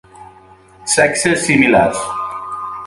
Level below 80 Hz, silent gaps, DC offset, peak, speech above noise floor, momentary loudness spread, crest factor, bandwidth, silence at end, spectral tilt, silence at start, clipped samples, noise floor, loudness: -48 dBFS; none; under 0.1%; 0 dBFS; 31 dB; 14 LU; 16 dB; 11.5 kHz; 0 s; -3.5 dB/octave; 0.15 s; under 0.1%; -44 dBFS; -14 LUFS